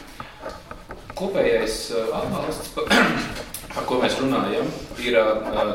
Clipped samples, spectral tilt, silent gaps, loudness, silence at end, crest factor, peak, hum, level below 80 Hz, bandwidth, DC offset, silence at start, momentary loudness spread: under 0.1%; -4 dB/octave; none; -23 LUFS; 0 s; 20 dB; -4 dBFS; none; -44 dBFS; 16.5 kHz; 0.1%; 0 s; 18 LU